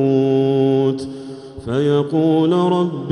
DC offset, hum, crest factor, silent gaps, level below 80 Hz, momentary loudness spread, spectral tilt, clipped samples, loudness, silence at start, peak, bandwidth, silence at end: under 0.1%; none; 12 dB; none; -52 dBFS; 15 LU; -8.5 dB/octave; under 0.1%; -17 LUFS; 0 s; -6 dBFS; 11 kHz; 0 s